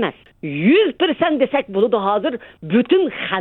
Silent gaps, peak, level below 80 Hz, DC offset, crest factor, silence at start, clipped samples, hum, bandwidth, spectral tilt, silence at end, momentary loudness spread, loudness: none; -2 dBFS; -58 dBFS; under 0.1%; 16 dB; 0 s; under 0.1%; none; 4.2 kHz; -9 dB/octave; 0 s; 10 LU; -18 LUFS